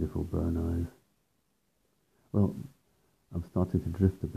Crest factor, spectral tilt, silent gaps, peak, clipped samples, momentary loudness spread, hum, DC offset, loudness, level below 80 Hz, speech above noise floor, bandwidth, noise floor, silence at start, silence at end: 22 dB; -10 dB/octave; none; -12 dBFS; under 0.1%; 12 LU; none; under 0.1%; -32 LUFS; -50 dBFS; 46 dB; 14 kHz; -76 dBFS; 0 s; 0 s